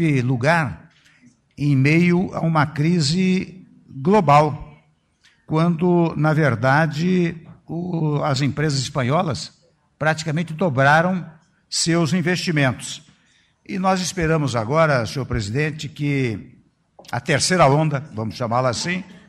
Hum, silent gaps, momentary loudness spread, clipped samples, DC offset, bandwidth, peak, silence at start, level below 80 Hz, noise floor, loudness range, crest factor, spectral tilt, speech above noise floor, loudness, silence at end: none; none; 13 LU; under 0.1%; under 0.1%; 12.5 kHz; -2 dBFS; 0 s; -48 dBFS; -60 dBFS; 3 LU; 18 dB; -5.5 dB/octave; 41 dB; -20 LUFS; 0.1 s